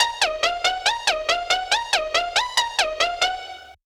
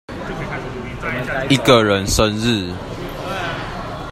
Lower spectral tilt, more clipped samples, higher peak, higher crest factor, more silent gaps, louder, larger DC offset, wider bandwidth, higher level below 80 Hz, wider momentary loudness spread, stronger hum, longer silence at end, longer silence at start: second, 1 dB/octave vs -4.5 dB/octave; neither; second, -6 dBFS vs 0 dBFS; about the same, 18 dB vs 20 dB; neither; about the same, -21 LUFS vs -19 LUFS; neither; first, over 20 kHz vs 16 kHz; second, -50 dBFS vs -36 dBFS; second, 3 LU vs 15 LU; neither; first, 0.15 s vs 0 s; about the same, 0 s vs 0.1 s